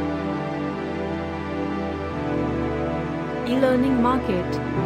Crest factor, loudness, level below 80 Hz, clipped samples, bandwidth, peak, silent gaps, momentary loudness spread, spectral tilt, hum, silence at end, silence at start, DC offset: 18 dB; -24 LUFS; -40 dBFS; under 0.1%; 13.5 kHz; -6 dBFS; none; 8 LU; -7.5 dB/octave; none; 0 s; 0 s; under 0.1%